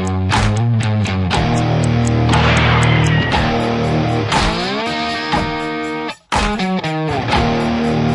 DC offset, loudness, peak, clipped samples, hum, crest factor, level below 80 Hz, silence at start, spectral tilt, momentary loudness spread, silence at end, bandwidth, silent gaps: under 0.1%; -16 LUFS; 0 dBFS; under 0.1%; none; 14 dB; -30 dBFS; 0 s; -5.5 dB/octave; 7 LU; 0 s; 11.5 kHz; none